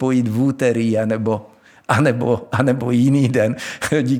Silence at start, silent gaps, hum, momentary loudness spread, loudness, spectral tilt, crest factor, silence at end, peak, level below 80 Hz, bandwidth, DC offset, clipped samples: 0 s; none; none; 6 LU; -18 LUFS; -7 dB/octave; 16 dB; 0 s; -2 dBFS; -56 dBFS; 16 kHz; under 0.1%; under 0.1%